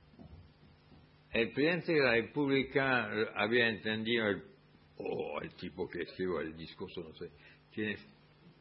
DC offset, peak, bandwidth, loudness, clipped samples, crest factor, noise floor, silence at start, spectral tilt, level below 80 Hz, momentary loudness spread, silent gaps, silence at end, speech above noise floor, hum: under 0.1%; -14 dBFS; 5.6 kHz; -34 LUFS; under 0.1%; 22 dB; -61 dBFS; 0.2 s; -3 dB/octave; -66 dBFS; 16 LU; none; 0.1 s; 27 dB; none